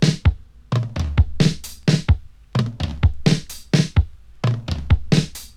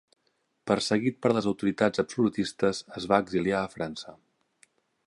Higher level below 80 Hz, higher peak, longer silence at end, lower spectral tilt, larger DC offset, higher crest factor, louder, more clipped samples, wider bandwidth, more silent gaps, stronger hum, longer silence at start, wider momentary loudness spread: first, -26 dBFS vs -62 dBFS; first, -2 dBFS vs -6 dBFS; second, 0.1 s vs 0.9 s; about the same, -6 dB/octave vs -5.5 dB/octave; neither; about the same, 18 dB vs 22 dB; first, -21 LUFS vs -27 LUFS; neither; first, 15 kHz vs 11.5 kHz; neither; neither; second, 0 s vs 0.65 s; second, 7 LU vs 10 LU